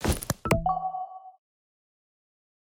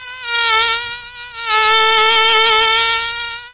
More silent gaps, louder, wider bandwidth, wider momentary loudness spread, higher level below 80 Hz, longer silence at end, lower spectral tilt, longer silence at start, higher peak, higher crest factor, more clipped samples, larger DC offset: neither; second, -29 LUFS vs -12 LUFS; first, 17.5 kHz vs 4 kHz; about the same, 14 LU vs 15 LU; first, -40 dBFS vs -48 dBFS; first, 1.35 s vs 0 s; first, -5 dB/octave vs -3.5 dB/octave; about the same, 0 s vs 0 s; second, -8 dBFS vs -2 dBFS; first, 24 dB vs 14 dB; neither; neither